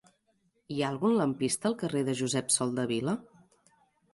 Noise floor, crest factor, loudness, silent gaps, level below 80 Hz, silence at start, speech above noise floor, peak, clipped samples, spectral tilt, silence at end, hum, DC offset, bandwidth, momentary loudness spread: -73 dBFS; 18 dB; -30 LUFS; none; -70 dBFS; 0.7 s; 43 dB; -14 dBFS; under 0.1%; -4.5 dB/octave; 0.9 s; none; under 0.1%; 12 kHz; 7 LU